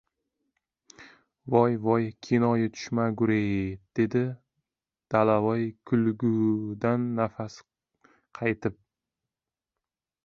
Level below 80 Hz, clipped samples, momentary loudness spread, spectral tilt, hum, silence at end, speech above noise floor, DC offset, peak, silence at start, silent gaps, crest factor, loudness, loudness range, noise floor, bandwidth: -60 dBFS; under 0.1%; 9 LU; -8 dB/octave; none; 1.5 s; over 64 dB; under 0.1%; -6 dBFS; 1 s; none; 22 dB; -27 LUFS; 5 LU; under -90 dBFS; 7 kHz